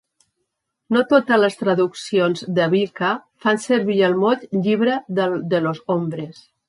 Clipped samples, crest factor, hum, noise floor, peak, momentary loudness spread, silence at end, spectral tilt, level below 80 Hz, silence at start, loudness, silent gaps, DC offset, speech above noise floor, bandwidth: under 0.1%; 16 dB; none; -76 dBFS; -4 dBFS; 7 LU; 0.35 s; -6 dB/octave; -68 dBFS; 0.9 s; -19 LUFS; none; under 0.1%; 57 dB; 11.5 kHz